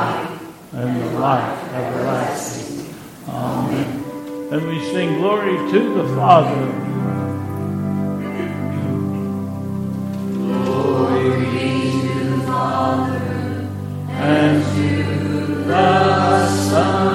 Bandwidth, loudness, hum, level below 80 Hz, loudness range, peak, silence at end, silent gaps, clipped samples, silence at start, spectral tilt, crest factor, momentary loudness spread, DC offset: 16.5 kHz; -19 LUFS; none; -56 dBFS; 6 LU; 0 dBFS; 0 s; none; under 0.1%; 0 s; -6.5 dB/octave; 18 dB; 11 LU; under 0.1%